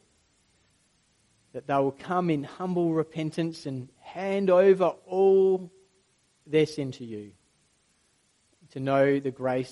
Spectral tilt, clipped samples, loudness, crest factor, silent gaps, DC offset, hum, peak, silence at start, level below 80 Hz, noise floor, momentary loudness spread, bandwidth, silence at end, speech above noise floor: -7.5 dB/octave; under 0.1%; -26 LUFS; 18 dB; none; under 0.1%; none; -10 dBFS; 1.55 s; -72 dBFS; -68 dBFS; 19 LU; 11.5 kHz; 0 s; 43 dB